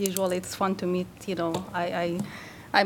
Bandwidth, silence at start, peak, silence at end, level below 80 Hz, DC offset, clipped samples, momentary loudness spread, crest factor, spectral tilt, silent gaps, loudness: 18 kHz; 0 s; -6 dBFS; 0 s; -60 dBFS; under 0.1%; under 0.1%; 7 LU; 24 dB; -4.5 dB/octave; none; -29 LUFS